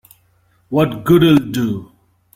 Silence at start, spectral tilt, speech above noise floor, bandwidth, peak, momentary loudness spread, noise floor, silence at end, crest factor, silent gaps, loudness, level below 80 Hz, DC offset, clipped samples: 0.7 s; -7 dB/octave; 43 dB; 16.5 kHz; -2 dBFS; 11 LU; -57 dBFS; 0.5 s; 16 dB; none; -15 LUFS; -46 dBFS; under 0.1%; under 0.1%